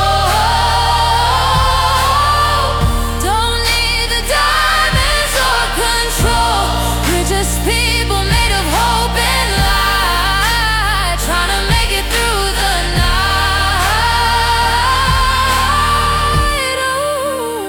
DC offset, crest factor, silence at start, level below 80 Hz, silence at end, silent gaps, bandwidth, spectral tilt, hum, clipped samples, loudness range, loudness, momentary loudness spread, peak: under 0.1%; 10 dB; 0 s; -20 dBFS; 0 s; none; over 20 kHz; -3 dB/octave; none; under 0.1%; 1 LU; -13 LUFS; 3 LU; -2 dBFS